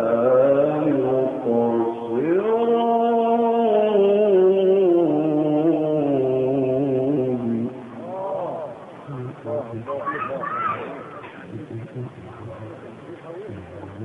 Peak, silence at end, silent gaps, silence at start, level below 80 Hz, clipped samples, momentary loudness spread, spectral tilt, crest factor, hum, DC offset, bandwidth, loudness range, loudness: -8 dBFS; 0 s; none; 0 s; -62 dBFS; under 0.1%; 20 LU; -9.5 dB/octave; 14 dB; none; under 0.1%; 3.8 kHz; 12 LU; -20 LUFS